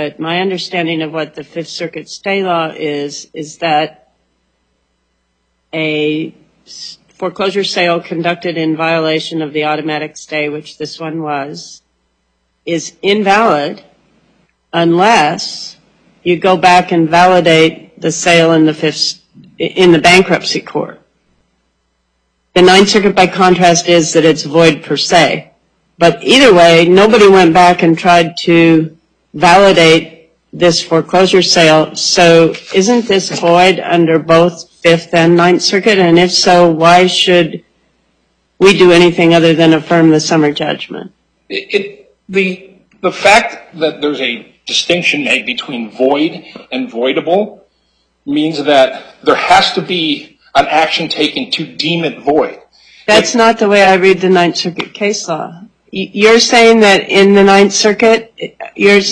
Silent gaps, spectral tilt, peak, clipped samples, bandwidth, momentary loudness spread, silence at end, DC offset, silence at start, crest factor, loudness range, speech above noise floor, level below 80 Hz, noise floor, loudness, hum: none; -4 dB/octave; 0 dBFS; under 0.1%; 11.5 kHz; 16 LU; 0 s; under 0.1%; 0 s; 10 dB; 10 LU; 53 dB; -48 dBFS; -63 dBFS; -10 LUFS; none